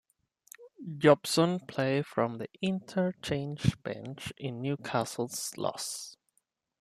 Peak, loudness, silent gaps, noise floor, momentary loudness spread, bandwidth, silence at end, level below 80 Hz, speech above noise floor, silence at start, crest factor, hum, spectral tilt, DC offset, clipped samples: -8 dBFS; -31 LUFS; none; -77 dBFS; 15 LU; 14.5 kHz; 0.65 s; -62 dBFS; 46 dB; 0.6 s; 24 dB; none; -5 dB/octave; under 0.1%; under 0.1%